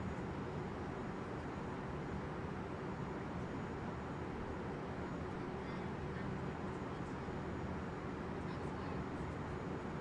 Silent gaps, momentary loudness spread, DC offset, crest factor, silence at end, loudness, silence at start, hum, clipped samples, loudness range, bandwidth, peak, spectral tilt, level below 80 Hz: none; 1 LU; under 0.1%; 12 dB; 0 s; -44 LUFS; 0 s; none; under 0.1%; 0 LU; 11 kHz; -30 dBFS; -7.5 dB/octave; -56 dBFS